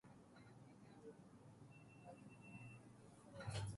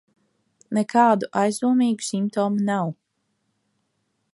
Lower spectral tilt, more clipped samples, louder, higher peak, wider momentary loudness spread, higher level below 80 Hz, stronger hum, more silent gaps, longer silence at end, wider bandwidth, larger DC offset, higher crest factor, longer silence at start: about the same, -5.5 dB/octave vs -5.5 dB/octave; neither; second, -59 LUFS vs -22 LUFS; second, -36 dBFS vs -4 dBFS; first, 11 LU vs 8 LU; about the same, -72 dBFS vs -74 dBFS; neither; neither; second, 0 s vs 1.4 s; about the same, 11.5 kHz vs 11.5 kHz; neither; about the same, 20 dB vs 20 dB; second, 0.05 s vs 0.7 s